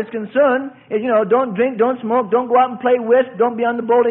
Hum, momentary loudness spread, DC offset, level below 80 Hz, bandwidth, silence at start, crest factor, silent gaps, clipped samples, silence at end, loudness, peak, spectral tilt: none; 6 LU; under 0.1%; -66 dBFS; 3.8 kHz; 0 s; 14 dB; none; under 0.1%; 0 s; -17 LUFS; -2 dBFS; -11 dB/octave